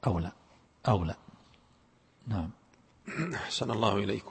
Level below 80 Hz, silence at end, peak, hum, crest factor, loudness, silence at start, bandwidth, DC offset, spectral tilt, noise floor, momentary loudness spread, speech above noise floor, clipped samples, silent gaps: -52 dBFS; 0 s; -12 dBFS; none; 22 dB; -33 LUFS; 0 s; 8.8 kHz; under 0.1%; -6 dB/octave; -65 dBFS; 14 LU; 34 dB; under 0.1%; none